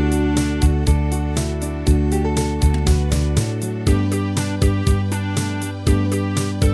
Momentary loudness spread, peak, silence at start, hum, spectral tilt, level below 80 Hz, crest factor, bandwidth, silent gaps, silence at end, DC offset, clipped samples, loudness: 5 LU; -4 dBFS; 0 s; none; -6 dB/octave; -22 dBFS; 14 dB; 11 kHz; none; 0 s; 0.1%; under 0.1%; -19 LUFS